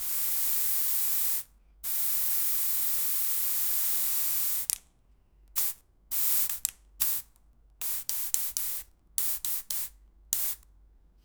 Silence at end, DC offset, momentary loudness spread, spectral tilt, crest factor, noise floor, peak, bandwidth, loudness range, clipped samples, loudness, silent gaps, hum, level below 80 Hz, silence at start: 0.7 s; under 0.1%; 9 LU; 2 dB/octave; 30 dB; -62 dBFS; 0 dBFS; over 20 kHz; 5 LU; under 0.1%; -27 LUFS; none; none; -62 dBFS; 0 s